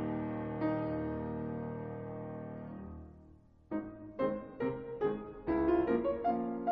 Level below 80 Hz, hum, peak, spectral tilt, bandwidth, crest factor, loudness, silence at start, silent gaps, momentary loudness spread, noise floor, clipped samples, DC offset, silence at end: -58 dBFS; none; -20 dBFS; -8 dB/octave; 5.2 kHz; 16 dB; -37 LUFS; 0 s; none; 15 LU; -60 dBFS; under 0.1%; under 0.1%; 0 s